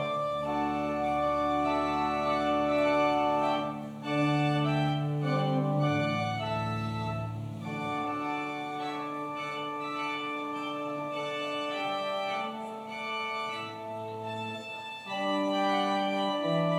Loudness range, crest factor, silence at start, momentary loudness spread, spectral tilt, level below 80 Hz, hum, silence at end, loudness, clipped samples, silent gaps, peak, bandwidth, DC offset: 6 LU; 14 dB; 0 s; 10 LU; -6.5 dB/octave; -60 dBFS; none; 0 s; -31 LUFS; under 0.1%; none; -16 dBFS; 13 kHz; under 0.1%